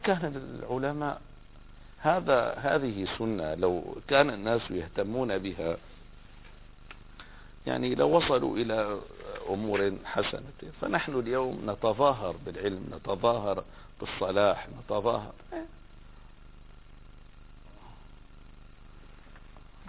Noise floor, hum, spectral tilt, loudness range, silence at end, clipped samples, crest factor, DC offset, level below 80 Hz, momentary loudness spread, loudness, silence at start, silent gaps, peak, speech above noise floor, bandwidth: -49 dBFS; 50 Hz at -55 dBFS; -9.5 dB/octave; 7 LU; 0 s; under 0.1%; 22 dB; under 0.1%; -52 dBFS; 17 LU; -30 LUFS; 0 s; none; -10 dBFS; 20 dB; 4 kHz